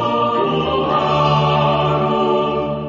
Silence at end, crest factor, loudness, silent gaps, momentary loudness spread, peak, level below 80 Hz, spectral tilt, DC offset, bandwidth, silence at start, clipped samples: 0 s; 14 dB; -16 LUFS; none; 3 LU; -4 dBFS; -40 dBFS; -7.5 dB/octave; under 0.1%; 7.4 kHz; 0 s; under 0.1%